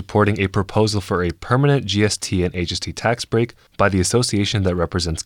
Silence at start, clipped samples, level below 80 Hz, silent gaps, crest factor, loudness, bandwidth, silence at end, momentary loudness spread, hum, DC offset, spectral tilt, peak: 0 s; under 0.1%; -40 dBFS; none; 16 dB; -19 LUFS; 16 kHz; 0.05 s; 5 LU; none; under 0.1%; -5 dB/octave; -4 dBFS